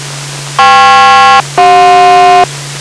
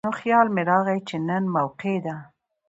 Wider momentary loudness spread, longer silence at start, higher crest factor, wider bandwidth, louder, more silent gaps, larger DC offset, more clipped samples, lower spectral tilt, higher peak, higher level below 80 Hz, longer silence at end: about the same, 11 LU vs 9 LU; about the same, 0 s vs 0.05 s; second, 4 dB vs 18 dB; first, 11 kHz vs 8 kHz; first, -4 LUFS vs -23 LUFS; neither; neither; neither; second, -2.5 dB/octave vs -7.5 dB/octave; first, -2 dBFS vs -6 dBFS; first, -40 dBFS vs -68 dBFS; second, 0 s vs 0.45 s